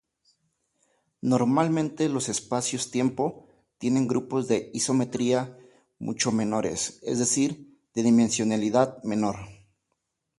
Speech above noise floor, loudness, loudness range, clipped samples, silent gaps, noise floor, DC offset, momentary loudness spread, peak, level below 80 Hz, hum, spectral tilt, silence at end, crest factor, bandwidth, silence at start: 54 dB; -26 LUFS; 2 LU; under 0.1%; none; -79 dBFS; under 0.1%; 10 LU; -8 dBFS; -62 dBFS; none; -4.5 dB/octave; 0.85 s; 20 dB; 11.5 kHz; 1.25 s